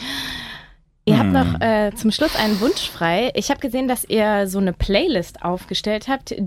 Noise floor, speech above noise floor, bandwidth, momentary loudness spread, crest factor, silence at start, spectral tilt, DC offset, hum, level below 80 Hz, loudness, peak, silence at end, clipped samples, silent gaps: -47 dBFS; 27 dB; 17 kHz; 8 LU; 18 dB; 0 s; -5 dB/octave; under 0.1%; none; -38 dBFS; -20 LUFS; -2 dBFS; 0 s; under 0.1%; none